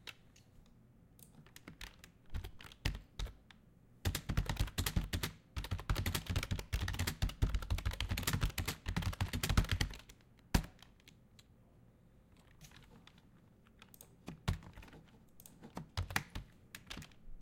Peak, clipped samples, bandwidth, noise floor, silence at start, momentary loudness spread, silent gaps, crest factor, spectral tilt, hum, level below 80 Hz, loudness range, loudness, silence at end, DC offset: -16 dBFS; under 0.1%; 17 kHz; -64 dBFS; 0.05 s; 22 LU; none; 26 dB; -4 dB/octave; none; -46 dBFS; 12 LU; -40 LUFS; 0 s; under 0.1%